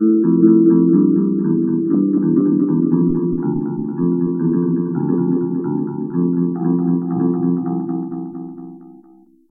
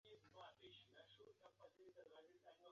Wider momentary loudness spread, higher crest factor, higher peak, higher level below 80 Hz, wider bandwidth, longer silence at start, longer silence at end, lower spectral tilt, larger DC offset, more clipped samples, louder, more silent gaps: first, 11 LU vs 6 LU; about the same, 16 dB vs 16 dB; first, 0 dBFS vs -50 dBFS; first, -52 dBFS vs under -90 dBFS; second, 1.8 kHz vs 7 kHz; about the same, 0 s vs 0.05 s; first, 0.65 s vs 0 s; first, -16 dB/octave vs -2 dB/octave; neither; neither; first, -17 LUFS vs -67 LUFS; neither